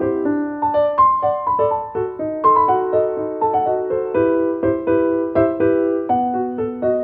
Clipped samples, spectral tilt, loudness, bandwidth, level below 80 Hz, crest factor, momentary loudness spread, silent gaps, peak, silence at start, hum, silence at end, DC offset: under 0.1%; -11 dB/octave; -18 LUFS; 4.3 kHz; -50 dBFS; 14 dB; 7 LU; none; -2 dBFS; 0 s; none; 0 s; under 0.1%